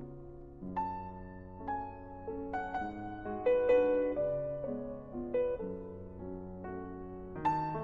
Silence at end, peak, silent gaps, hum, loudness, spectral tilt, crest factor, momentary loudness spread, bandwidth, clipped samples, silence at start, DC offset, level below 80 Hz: 0 s; -18 dBFS; none; none; -36 LUFS; -9 dB/octave; 18 dB; 16 LU; 4.8 kHz; under 0.1%; 0 s; under 0.1%; -54 dBFS